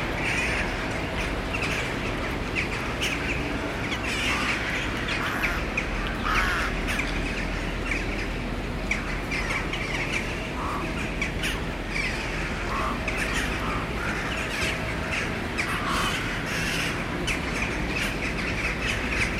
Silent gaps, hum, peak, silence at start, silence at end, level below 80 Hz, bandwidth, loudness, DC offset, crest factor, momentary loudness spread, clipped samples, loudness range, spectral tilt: none; none; -10 dBFS; 0 s; 0 s; -36 dBFS; 16 kHz; -27 LUFS; under 0.1%; 18 dB; 4 LU; under 0.1%; 2 LU; -4 dB/octave